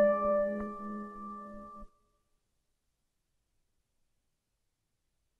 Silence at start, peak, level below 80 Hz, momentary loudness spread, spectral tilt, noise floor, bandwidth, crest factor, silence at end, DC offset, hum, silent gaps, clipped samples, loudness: 0 s; -18 dBFS; -62 dBFS; 20 LU; -9 dB/octave; -82 dBFS; 3.1 kHz; 20 dB; 3.55 s; under 0.1%; none; none; under 0.1%; -34 LUFS